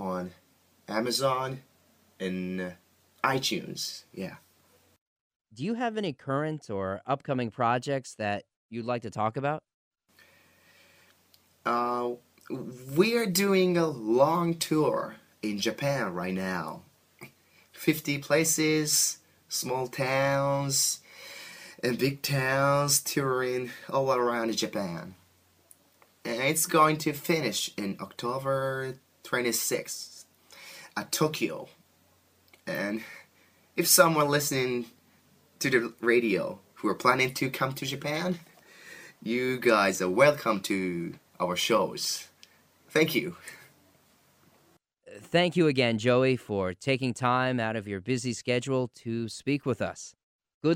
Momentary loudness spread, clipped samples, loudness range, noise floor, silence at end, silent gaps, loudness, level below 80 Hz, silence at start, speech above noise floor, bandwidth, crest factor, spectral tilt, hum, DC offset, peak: 15 LU; under 0.1%; 8 LU; -66 dBFS; 0 s; 5.01-5.40 s, 8.56-8.69 s, 9.74-9.91 s, 50.23-50.39 s, 50.54-50.61 s; -28 LUFS; -70 dBFS; 0 s; 38 dB; 15.5 kHz; 24 dB; -4 dB/octave; none; under 0.1%; -4 dBFS